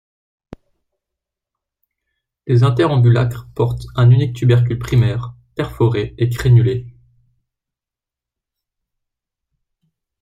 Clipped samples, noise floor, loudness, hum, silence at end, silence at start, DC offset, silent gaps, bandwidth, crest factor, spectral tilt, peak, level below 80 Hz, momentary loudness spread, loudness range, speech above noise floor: under 0.1%; -87 dBFS; -16 LUFS; none; 3.3 s; 2.45 s; under 0.1%; none; 9 kHz; 16 dB; -8 dB/octave; -2 dBFS; -40 dBFS; 13 LU; 6 LU; 73 dB